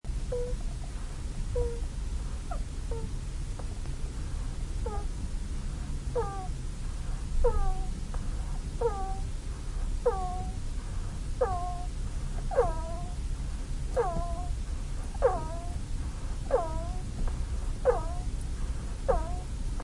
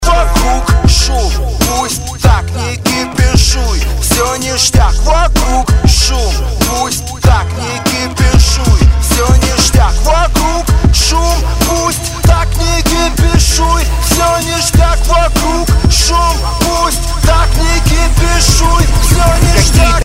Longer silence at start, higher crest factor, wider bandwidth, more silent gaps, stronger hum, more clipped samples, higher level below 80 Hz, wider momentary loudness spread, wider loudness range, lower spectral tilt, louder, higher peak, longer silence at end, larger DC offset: about the same, 0.05 s vs 0 s; first, 18 dB vs 8 dB; second, 11.5 kHz vs 16.5 kHz; neither; neither; second, under 0.1% vs 0.4%; second, -32 dBFS vs -12 dBFS; first, 9 LU vs 5 LU; about the same, 4 LU vs 2 LU; first, -6 dB/octave vs -4 dB/octave; second, -35 LUFS vs -11 LUFS; second, -12 dBFS vs 0 dBFS; about the same, 0 s vs 0 s; neither